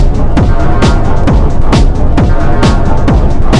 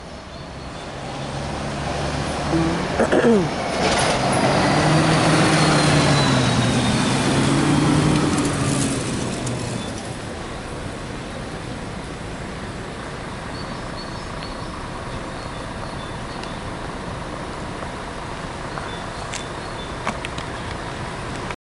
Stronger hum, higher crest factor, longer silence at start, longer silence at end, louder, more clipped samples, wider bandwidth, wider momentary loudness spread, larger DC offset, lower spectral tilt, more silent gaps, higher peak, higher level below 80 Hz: neither; second, 6 dB vs 18 dB; about the same, 0 s vs 0 s; second, 0 s vs 0.25 s; first, -10 LUFS vs -22 LUFS; first, 0.5% vs under 0.1%; second, 9.4 kHz vs 11.5 kHz; second, 1 LU vs 14 LU; neither; first, -7 dB/octave vs -5 dB/octave; neither; first, 0 dBFS vs -4 dBFS; first, -8 dBFS vs -38 dBFS